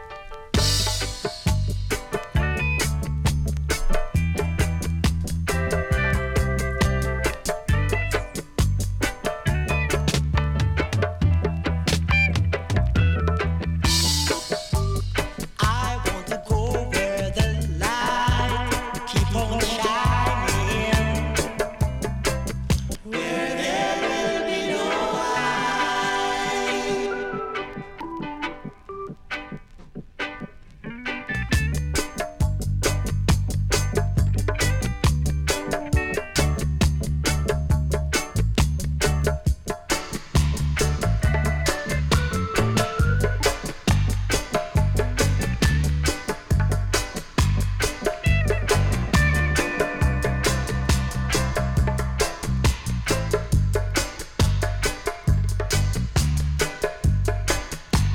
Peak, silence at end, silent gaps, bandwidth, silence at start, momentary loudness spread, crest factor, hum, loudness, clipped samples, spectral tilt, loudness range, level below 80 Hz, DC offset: -4 dBFS; 0 s; none; 18 kHz; 0 s; 6 LU; 18 dB; none; -24 LUFS; under 0.1%; -4.5 dB/octave; 3 LU; -28 dBFS; under 0.1%